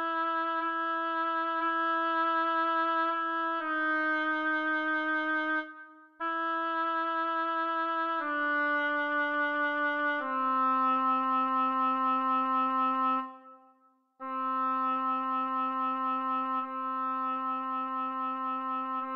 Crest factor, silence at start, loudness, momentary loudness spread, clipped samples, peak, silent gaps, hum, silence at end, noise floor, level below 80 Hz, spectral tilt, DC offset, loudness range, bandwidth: 12 dB; 0 s; -30 LUFS; 5 LU; under 0.1%; -18 dBFS; none; none; 0 s; -66 dBFS; -88 dBFS; 1.5 dB/octave; under 0.1%; 4 LU; 6 kHz